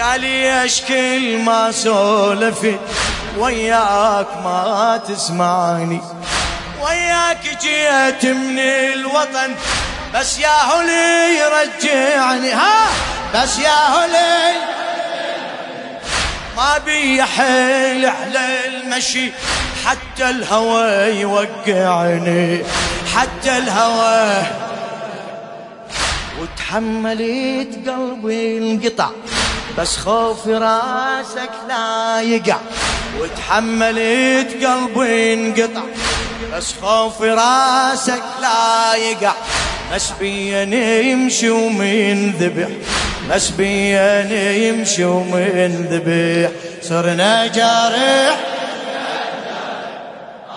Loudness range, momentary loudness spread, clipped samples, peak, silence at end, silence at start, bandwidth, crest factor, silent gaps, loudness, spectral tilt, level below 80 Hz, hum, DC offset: 4 LU; 9 LU; under 0.1%; 0 dBFS; 0 s; 0 s; 11 kHz; 16 dB; none; -16 LUFS; -3 dB/octave; -38 dBFS; none; under 0.1%